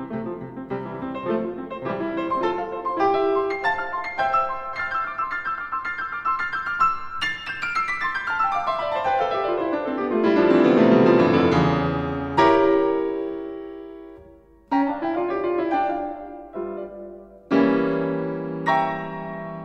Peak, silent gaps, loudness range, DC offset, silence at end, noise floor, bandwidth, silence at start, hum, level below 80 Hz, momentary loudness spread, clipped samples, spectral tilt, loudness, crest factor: -4 dBFS; none; 8 LU; under 0.1%; 0 s; -49 dBFS; 9.4 kHz; 0 s; none; -52 dBFS; 15 LU; under 0.1%; -7 dB/octave; -23 LUFS; 18 dB